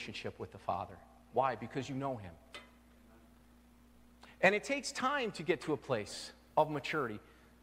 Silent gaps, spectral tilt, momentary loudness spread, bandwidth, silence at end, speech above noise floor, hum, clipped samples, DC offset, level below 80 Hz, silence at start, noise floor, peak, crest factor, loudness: none; -4.5 dB/octave; 19 LU; 16 kHz; 0.4 s; 26 dB; none; under 0.1%; under 0.1%; -66 dBFS; 0 s; -62 dBFS; -14 dBFS; 24 dB; -36 LUFS